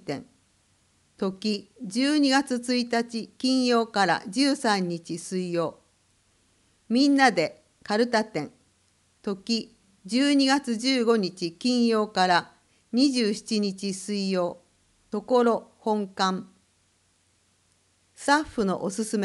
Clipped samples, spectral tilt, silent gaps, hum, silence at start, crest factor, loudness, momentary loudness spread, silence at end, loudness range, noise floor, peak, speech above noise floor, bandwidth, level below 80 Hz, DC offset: under 0.1%; -4 dB/octave; none; none; 0.05 s; 20 dB; -25 LUFS; 11 LU; 0 s; 5 LU; -67 dBFS; -6 dBFS; 42 dB; 12 kHz; -66 dBFS; under 0.1%